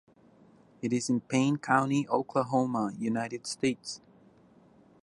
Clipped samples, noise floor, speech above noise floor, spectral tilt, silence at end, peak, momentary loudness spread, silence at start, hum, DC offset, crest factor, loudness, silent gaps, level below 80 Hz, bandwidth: under 0.1%; -60 dBFS; 31 dB; -5.5 dB/octave; 1.05 s; -10 dBFS; 11 LU; 0.85 s; none; under 0.1%; 22 dB; -30 LUFS; none; -72 dBFS; 11.5 kHz